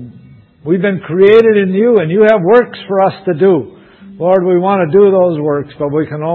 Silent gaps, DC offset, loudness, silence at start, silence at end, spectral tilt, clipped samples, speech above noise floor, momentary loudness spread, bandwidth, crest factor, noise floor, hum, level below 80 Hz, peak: none; under 0.1%; -11 LUFS; 0 s; 0 s; -9.5 dB/octave; 0.2%; 29 dB; 9 LU; 4.4 kHz; 10 dB; -39 dBFS; none; -54 dBFS; 0 dBFS